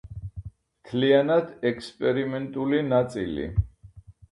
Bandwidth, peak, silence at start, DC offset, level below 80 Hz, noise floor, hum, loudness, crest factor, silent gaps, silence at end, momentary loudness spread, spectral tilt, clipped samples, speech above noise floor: 11.5 kHz; -8 dBFS; 0.05 s; under 0.1%; -42 dBFS; -49 dBFS; none; -25 LUFS; 18 dB; none; 0.2 s; 18 LU; -7.5 dB/octave; under 0.1%; 25 dB